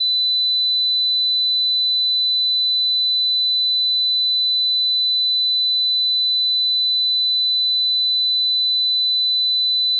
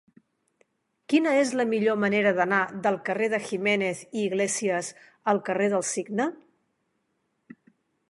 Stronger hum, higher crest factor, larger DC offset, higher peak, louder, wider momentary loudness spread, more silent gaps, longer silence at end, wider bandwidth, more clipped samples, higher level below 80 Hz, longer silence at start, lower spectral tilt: neither; second, 4 dB vs 20 dB; neither; second, -14 dBFS vs -8 dBFS; first, -15 LUFS vs -25 LUFS; second, 0 LU vs 7 LU; neither; second, 0 s vs 1.75 s; second, 4.3 kHz vs 11.5 kHz; neither; second, under -90 dBFS vs -76 dBFS; second, 0 s vs 1.1 s; second, 12 dB/octave vs -4 dB/octave